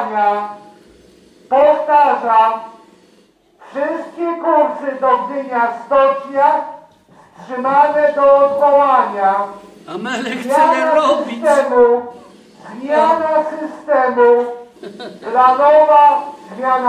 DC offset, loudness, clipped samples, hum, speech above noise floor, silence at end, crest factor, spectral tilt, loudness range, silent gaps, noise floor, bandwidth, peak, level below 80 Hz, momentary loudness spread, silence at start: under 0.1%; -14 LUFS; under 0.1%; none; 38 dB; 0 s; 14 dB; -4.5 dB/octave; 4 LU; none; -52 dBFS; 11 kHz; 0 dBFS; -60 dBFS; 16 LU; 0 s